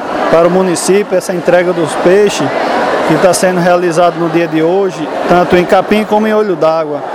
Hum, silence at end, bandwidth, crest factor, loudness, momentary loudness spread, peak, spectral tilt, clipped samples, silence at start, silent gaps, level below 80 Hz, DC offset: none; 0 s; 16 kHz; 10 dB; -10 LUFS; 4 LU; 0 dBFS; -5 dB/octave; 0.3%; 0 s; none; -44 dBFS; under 0.1%